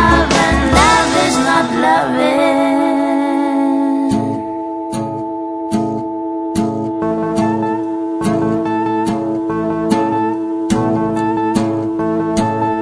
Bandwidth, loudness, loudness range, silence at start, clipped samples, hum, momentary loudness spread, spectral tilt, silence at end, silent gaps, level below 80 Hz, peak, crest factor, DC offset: 11 kHz; -15 LUFS; 6 LU; 0 s; under 0.1%; none; 10 LU; -5 dB/octave; 0 s; none; -32 dBFS; 0 dBFS; 14 dB; under 0.1%